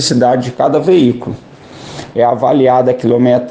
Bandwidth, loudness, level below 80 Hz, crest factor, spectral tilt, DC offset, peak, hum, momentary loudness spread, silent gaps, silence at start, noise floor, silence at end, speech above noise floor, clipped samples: 9.6 kHz; -11 LUFS; -50 dBFS; 12 dB; -6 dB/octave; under 0.1%; 0 dBFS; none; 16 LU; none; 0 s; -31 dBFS; 0 s; 21 dB; under 0.1%